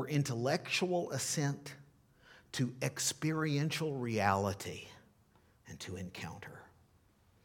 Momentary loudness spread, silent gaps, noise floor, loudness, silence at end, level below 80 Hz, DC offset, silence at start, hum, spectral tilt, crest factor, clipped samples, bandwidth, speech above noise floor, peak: 18 LU; none; -68 dBFS; -36 LUFS; 0.8 s; -74 dBFS; under 0.1%; 0 s; none; -4.5 dB/octave; 22 dB; under 0.1%; 18 kHz; 33 dB; -16 dBFS